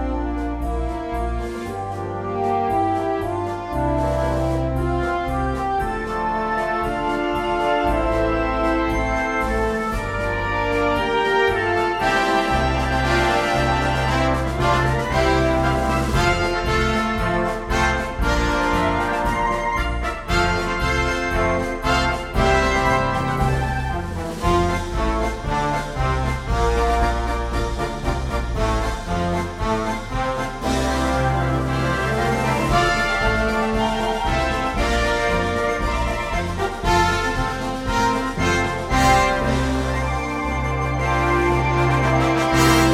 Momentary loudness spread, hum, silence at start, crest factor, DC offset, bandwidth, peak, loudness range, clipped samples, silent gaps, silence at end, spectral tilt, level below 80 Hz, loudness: 6 LU; none; 0 s; 18 dB; under 0.1%; 15.5 kHz; -2 dBFS; 3 LU; under 0.1%; none; 0 s; -5.5 dB/octave; -28 dBFS; -21 LUFS